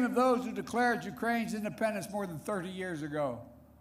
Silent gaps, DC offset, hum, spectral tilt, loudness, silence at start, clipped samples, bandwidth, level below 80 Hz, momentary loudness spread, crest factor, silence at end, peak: none; under 0.1%; none; -5.5 dB/octave; -33 LUFS; 0 s; under 0.1%; 16 kHz; -64 dBFS; 9 LU; 14 dB; 0.2 s; -18 dBFS